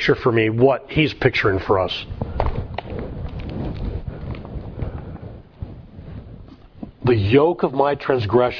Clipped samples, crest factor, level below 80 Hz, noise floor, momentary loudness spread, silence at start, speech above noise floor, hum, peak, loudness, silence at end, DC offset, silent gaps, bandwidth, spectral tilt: under 0.1%; 20 dB; -34 dBFS; -41 dBFS; 21 LU; 0 s; 23 dB; none; 0 dBFS; -20 LUFS; 0 s; under 0.1%; none; 5.4 kHz; -8 dB/octave